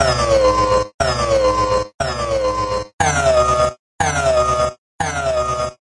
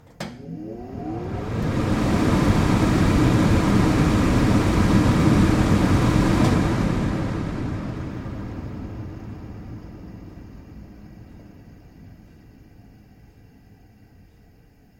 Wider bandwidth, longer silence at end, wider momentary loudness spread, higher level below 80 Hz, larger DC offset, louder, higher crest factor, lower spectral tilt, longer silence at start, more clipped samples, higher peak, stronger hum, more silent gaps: second, 11.5 kHz vs 16 kHz; second, 0.25 s vs 2.9 s; second, 8 LU vs 21 LU; about the same, -32 dBFS vs -32 dBFS; neither; first, -17 LUFS vs -20 LUFS; about the same, 16 dB vs 18 dB; second, -4 dB/octave vs -7 dB/octave; second, 0 s vs 0.2 s; neither; about the same, -2 dBFS vs -4 dBFS; neither; first, 0.94-0.98 s, 1.94-1.99 s, 2.93-2.98 s, 3.79-3.98 s, 4.78-4.98 s vs none